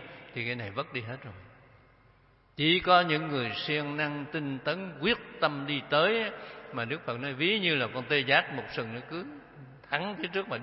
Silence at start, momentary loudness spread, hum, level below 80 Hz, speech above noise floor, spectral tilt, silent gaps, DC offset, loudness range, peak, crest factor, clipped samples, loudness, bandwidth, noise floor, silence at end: 0 s; 16 LU; none; -64 dBFS; 32 dB; -8.5 dB/octave; none; under 0.1%; 2 LU; -8 dBFS; 22 dB; under 0.1%; -29 LUFS; 5.8 kHz; -62 dBFS; 0 s